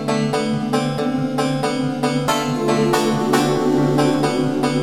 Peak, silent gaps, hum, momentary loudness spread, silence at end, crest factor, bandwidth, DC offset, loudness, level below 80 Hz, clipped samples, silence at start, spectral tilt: -4 dBFS; none; none; 4 LU; 0 s; 14 dB; 16.5 kHz; under 0.1%; -19 LUFS; -50 dBFS; under 0.1%; 0 s; -5.5 dB/octave